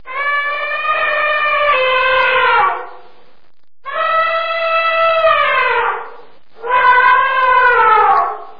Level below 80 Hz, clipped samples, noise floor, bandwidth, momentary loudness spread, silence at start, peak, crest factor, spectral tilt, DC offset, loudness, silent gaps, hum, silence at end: -50 dBFS; under 0.1%; -53 dBFS; 5.2 kHz; 8 LU; 0.05 s; 0 dBFS; 14 dB; -3.5 dB/octave; 2%; -12 LUFS; none; none; 0.1 s